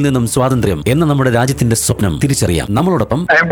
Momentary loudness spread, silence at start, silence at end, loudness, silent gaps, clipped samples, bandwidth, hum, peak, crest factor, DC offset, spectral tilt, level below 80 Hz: 3 LU; 0 s; 0 s; -14 LUFS; none; under 0.1%; 19.5 kHz; none; -2 dBFS; 10 dB; under 0.1%; -5.5 dB/octave; -32 dBFS